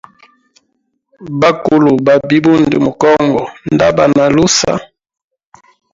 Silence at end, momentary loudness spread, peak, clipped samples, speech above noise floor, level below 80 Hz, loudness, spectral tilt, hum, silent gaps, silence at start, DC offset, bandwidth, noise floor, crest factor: 1.1 s; 7 LU; 0 dBFS; under 0.1%; 55 dB; -44 dBFS; -11 LUFS; -5 dB/octave; none; none; 1.2 s; under 0.1%; 7.8 kHz; -65 dBFS; 12 dB